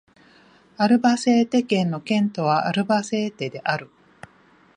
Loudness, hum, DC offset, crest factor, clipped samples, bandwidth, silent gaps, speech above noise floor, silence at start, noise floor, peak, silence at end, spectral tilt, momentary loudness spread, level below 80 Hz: -21 LUFS; none; under 0.1%; 16 dB; under 0.1%; 10.5 kHz; none; 35 dB; 0.8 s; -55 dBFS; -6 dBFS; 0.9 s; -5.5 dB/octave; 8 LU; -68 dBFS